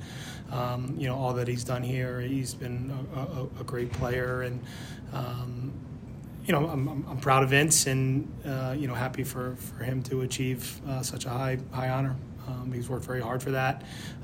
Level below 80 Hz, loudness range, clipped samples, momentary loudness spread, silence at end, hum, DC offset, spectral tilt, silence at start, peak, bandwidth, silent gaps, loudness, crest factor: -52 dBFS; 7 LU; under 0.1%; 12 LU; 0 s; none; under 0.1%; -4.5 dB/octave; 0 s; -10 dBFS; 16 kHz; none; -30 LUFS; 20 dB